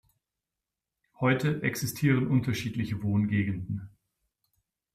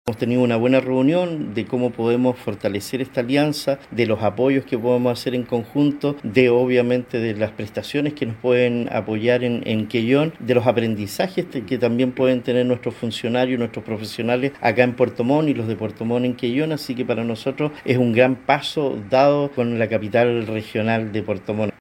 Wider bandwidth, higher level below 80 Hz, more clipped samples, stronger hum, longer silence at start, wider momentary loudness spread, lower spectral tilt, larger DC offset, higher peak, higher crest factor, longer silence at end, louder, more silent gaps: about the same, 15 kHz vs 16.5 kHz; about the same, -60 dBFS vs -58 dBFS; neither; neither; first, 1.2 s vs 0.05 s; about the same, 7 LU vs 8 LU; about the same, -6.5 dB/octave vs -6.5 dB/octave; neither; second, -12 dBFS vs 0 dBFS; about the same, 18 dB vs 20 dB; first, 1.05 s vs 0.1 s; second, -29 LUFS vs -20 LUFS; neither